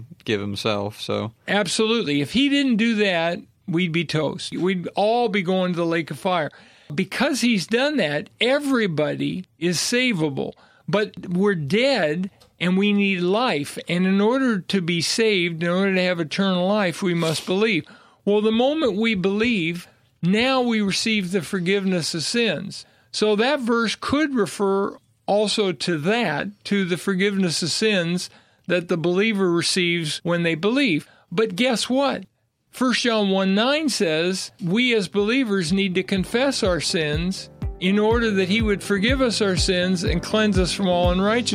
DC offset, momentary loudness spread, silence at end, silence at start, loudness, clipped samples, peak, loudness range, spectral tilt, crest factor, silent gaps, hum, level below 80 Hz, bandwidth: under 0.1%; 7 LU; 0 s; 0 s; -21 LUFS; under 0.1%; -4 dBFS; 2 LU; -4.5 dB/octave; 18 dB; none; none; -42 dBFS; 14.5 kHz